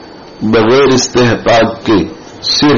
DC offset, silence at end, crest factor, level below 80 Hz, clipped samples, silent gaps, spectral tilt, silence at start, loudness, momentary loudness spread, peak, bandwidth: under 0.1%; 0 s; 10 dB; -38 dBFS; under 0.1%; none; -3.5 dB/octave; 0 s; -10 LUFS; 10 LU; 0 dBFS; 7.4 kHz